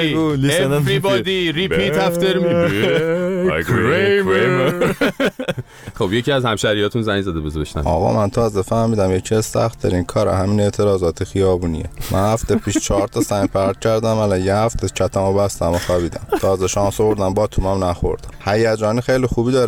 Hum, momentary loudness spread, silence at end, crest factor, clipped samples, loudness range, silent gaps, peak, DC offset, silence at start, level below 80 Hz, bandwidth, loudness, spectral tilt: none; 5 LU; 0 s; 12 dB; under 0.1%; 2 LU; none; -4 dBFS; under 0.1%; 0 s; -34 dBFS; 19.5 kHz; -18 LUFS; -5.5 dB/octave